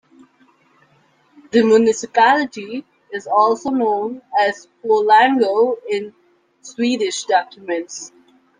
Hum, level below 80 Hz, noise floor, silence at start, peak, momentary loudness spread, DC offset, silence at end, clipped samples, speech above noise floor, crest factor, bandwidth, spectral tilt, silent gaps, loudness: none; -68 dBFS; -57 dBFS; 1.55 s; -2 dBFS; 18 LU; under 0.1%; 0.5 s; under 0.1%; 40 dB; 16 dB; 9.8 kHz; -3.5 dB/octave; none; -17 LUFS